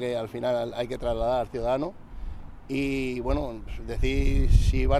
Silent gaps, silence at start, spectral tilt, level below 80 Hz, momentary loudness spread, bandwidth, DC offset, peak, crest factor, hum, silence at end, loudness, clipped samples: none; 0 s; -7 dB/octave; -28 dBFS; 17 LU; 12 kHz; under 0.1%; -6 dBFS; 18 dB; none; 0 s; -28 LUFS; under 0.1%